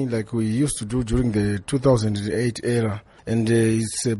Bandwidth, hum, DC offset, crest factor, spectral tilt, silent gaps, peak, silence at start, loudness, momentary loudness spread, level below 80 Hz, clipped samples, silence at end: 11.5 kHz; none; under 0.1%; 16 dB; -6 dB/octave; none; -6 dBFS; 0 s; -22 LUFS; 6 LU; -40 dBFS; under 0.1%; 0 s